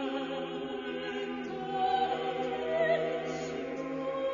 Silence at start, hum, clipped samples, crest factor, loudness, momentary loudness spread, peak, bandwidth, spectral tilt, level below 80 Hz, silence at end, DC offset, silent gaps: 0 s; none; under 0.1%; 16 dB; -33 LUFS; 8 LU; -18 dBFS; 7.2 kHz; -3 dB/octave; -66 dBFS; 0 s; under 0.1%; none